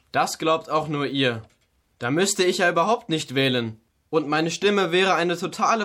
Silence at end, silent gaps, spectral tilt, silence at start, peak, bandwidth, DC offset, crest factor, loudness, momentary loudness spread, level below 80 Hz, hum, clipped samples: 0 s; none; -4 dB/octave; 0.15 s; -8 dBFS; 16.5 kHz; under 0.1%; 14 dB; -22 LUFS; 7 LU; -66 dBFS; none; under 0.1%